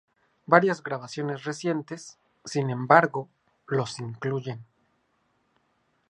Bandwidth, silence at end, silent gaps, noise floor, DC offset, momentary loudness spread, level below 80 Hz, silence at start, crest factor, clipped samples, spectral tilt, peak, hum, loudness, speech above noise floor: 11 kHz; 1.5 s; none; -71 dBFS; under 0.1%; 20 LU; -74 dBFS; 0.5 s; 26 dB; under 0.1%; -6 dB/octave; -2 dBFS; none; -26 LUFS; 45 dB